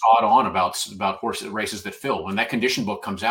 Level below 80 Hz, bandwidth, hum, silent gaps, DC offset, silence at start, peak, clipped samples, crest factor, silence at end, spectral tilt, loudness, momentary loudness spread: -60 dBFS; 17 kHz; none; none; under 0.1%; 0 s; -4 dBFS; under 0.1%; 18 dB; 0 s; -3.5 dB/octave; -22 LUFS; 11 LU